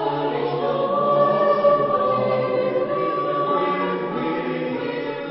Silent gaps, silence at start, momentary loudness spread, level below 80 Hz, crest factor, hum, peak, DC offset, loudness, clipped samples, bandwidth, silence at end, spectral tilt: none; 0 s; 8 LU; -62 dBFS; 16 dB; none; -6 dBFS; under 0.1%; -21 LUFS; under 0.1%; 5.8 kHz; 0 s; -11 dB/octave